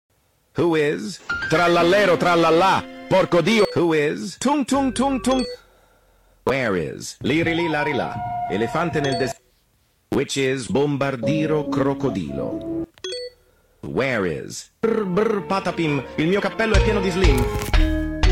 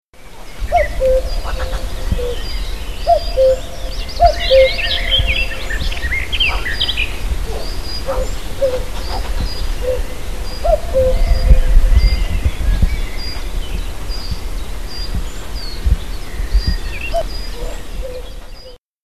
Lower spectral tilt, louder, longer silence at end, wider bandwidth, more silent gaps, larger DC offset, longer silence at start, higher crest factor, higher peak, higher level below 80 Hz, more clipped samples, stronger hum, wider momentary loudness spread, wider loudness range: about the same, -5.5 dB/octave vs -4.5 dB/octave; about the same, -21 LUFS vs -19 LUFS; about the same, 0 s vs 0 s; first, 16.5 kHz vs 14 kHz; second, none vs 0.08-0.13 s, 18.78-18.86 s; second, under 0.1% vs 6%; first, 0.55 s vs 0 s; about the same, 16 dB vs 16 dB; second, -4 dBFS vs 0 dBFS; second, -30 dBFS vs -18 dBFS; neither; neither; about the same, 12 LU vs 14 LU; second, 6 LU vs 9 LU